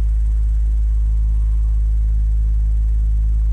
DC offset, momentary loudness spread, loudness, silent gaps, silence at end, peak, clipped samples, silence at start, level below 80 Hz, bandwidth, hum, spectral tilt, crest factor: under 0.1%; 0 LU; -20 LUFS; none; 0 s; -12 dBFS; under 0.1%; 0 s; -16 dBFS; 1 kHz; none; -8.5 dB/octave; 4 dB